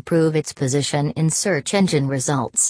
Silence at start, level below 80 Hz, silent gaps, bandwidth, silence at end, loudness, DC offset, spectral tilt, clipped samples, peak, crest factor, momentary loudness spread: 0.05 s; -56 dBFS; none; 11 kHz; 0 s; -20 LUFS; under 0.1%; -4.5 dB/octave; under 0.1%; -4 dBFS; 14 dB; 3 LU